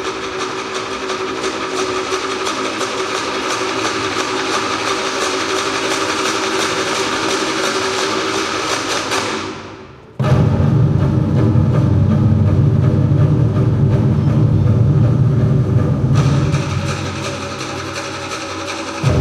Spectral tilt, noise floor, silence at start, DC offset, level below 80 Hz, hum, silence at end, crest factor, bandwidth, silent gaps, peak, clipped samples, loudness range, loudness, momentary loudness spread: -5.5 dB/octave; -36 dBFS; 0 s; under 0.1%; -34 dBFS; none; 0 s; 14 dB; 13 kHz; none; -2 dBFS; under 0.1%; 5 LU; -16 LUFS; 9 LU